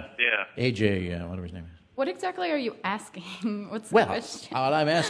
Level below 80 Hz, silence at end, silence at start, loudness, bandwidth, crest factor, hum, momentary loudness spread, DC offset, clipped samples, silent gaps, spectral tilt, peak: -56 dBFS; 0 s; 0 s; -28 LUFS; 11 kHz; 20 dB; none; 14 LU; under 0.1%; under 0.1%; none; -5 dB/octave; -8 dBFS